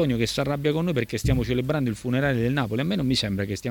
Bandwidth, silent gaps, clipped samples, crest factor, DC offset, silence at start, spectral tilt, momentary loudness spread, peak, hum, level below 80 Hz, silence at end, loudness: 19 kHz; none; under 0.1%; 16 dB; under 0.1%; 0 s; -6 dB/octave; 2 LU; -8 dBFS; none; -40 dBFS; 0 s; -25 LUFS